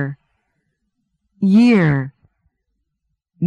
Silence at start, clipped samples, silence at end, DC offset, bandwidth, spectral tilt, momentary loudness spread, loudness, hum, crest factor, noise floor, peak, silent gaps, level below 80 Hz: 0 s; under 0.1%; 0 s; under 0.1%; 9.4 kHz; -8.5 dB/octave; 16 LU; -15 LUFS; none; 14 dB; -74 dBFS; -4 dBFS; none; -54 dBFS